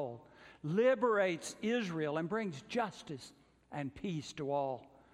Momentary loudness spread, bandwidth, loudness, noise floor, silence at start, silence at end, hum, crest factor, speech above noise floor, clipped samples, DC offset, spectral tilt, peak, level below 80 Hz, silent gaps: 17 LU; 13 kHz; -36 LUFS; -57 dBFS; 0 s; 0.3 s; none; 16 dB; 21 dB; under 0.1%; under 0.1%; -5.5 dB/octave; -20 dBFS; -72 dBFS; none